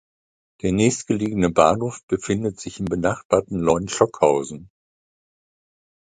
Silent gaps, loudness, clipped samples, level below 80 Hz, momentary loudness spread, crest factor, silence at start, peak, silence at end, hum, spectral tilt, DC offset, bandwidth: 2.03-2.08 s, 3.25-3.30 s; -21 LUFS; under 0.1%; -48 dBFS; 10 LU; 22 dB; 0.65 s; 0 dBFS; 1.5 s; none; -5.5 dB/octave; under 0.1%; 9.6 kHz